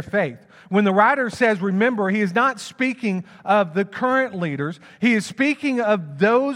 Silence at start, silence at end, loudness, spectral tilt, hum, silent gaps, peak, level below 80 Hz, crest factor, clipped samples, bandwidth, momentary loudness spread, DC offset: 0 s; 0 s; -20 LUFS; -6 dB/octave; none; none; -2 dBFS; -68 dBFS; 18 dB; under 0.1%; 11.5 kHz; 7 LU; under 0.1%